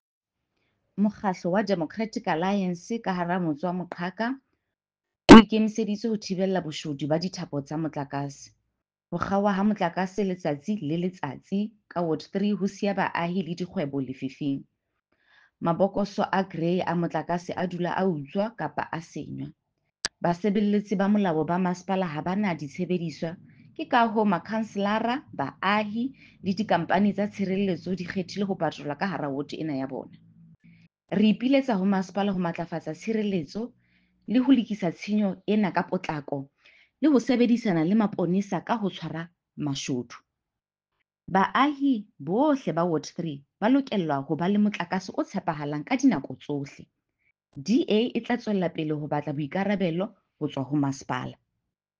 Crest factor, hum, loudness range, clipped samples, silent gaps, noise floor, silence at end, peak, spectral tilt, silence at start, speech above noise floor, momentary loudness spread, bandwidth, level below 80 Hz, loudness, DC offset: 24 dB; none; 9 LU; under 0.1%; none; -89 dBFS; 0.65 s; -2 dBFS; -6.5 dB/octave; 0.95 s; 63 dB; 11 LU; 8.8 kHz; -54 dBFS; -26 LUFS; under 0.1%